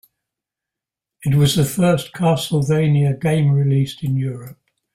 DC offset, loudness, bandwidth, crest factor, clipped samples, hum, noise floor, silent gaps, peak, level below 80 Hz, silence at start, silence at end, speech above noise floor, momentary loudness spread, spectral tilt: under 0.1%; -18 LUFS; 15.5 kHz; 14 dB; under 0.1%; none; -86 dBFS; none; -4 dBFS; -50 dBFS; 1.2 s; 0.45 s; 69 dB; 7 LU; -6.5 dB/octave